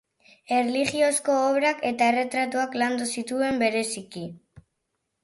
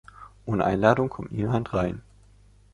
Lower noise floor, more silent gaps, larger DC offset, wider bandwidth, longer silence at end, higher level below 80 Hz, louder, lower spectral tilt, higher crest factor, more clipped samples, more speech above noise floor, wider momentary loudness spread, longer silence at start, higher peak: first, -79 dBFS vs -55 dBFS; neither; neither; about the same, 12 kHz vs 11 kHz; about the same, 0.65 s vs 0.75 s; second, -66 dBFS vs -48 dBFS; about the same, -24 LUFS vs -25 LUFS; second, -3 dB/octave vs -8 dB/octave; second, 16 dB vs 24 dB; neither; first, 54 dB vs 31 dB; second, 9 LU vs 12 LU; first, 0.5 s vs 0.2 s; second, -10 dBFS vs -4 dBFS